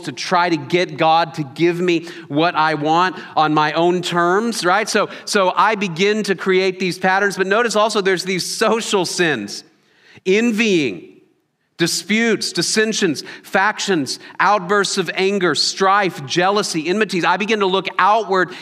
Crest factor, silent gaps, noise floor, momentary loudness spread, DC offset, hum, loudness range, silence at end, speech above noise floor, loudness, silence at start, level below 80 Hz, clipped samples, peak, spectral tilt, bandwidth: 18 dB; none; -64 dBFS; 4 LU; under 0.1%; none; 2 LU; 0 s; 47 dB; -17 LUFS; 0 s; -72 dBFS; under 0.1%; 0 dBFS; -3.5 dB/octave; 15.5 kHz